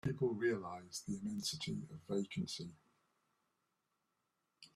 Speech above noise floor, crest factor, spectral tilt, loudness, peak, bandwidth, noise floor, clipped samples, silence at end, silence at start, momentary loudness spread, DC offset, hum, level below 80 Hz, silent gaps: 45 dB; 18 dB; -5 dB/octave; -42 LUFS; -24 dBFS; 14 kHz; -86 dBFS; under 0.1%; 0.1 s; 0.05 s; 10 LU; under 0.1%; none; -72 dBFS; none